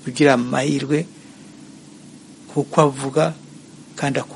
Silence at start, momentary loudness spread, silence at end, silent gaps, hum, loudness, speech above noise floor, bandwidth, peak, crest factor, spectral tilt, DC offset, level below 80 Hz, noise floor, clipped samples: 0 s; 22 LU; 0 s; none; none; -20 LUFS; 24 dB; 11.5 kHz; 0 dBFS; 20 dB; -5.5 dB/octave; under 0.1%; -62 dBFS; -42 dBFS; under 0.1%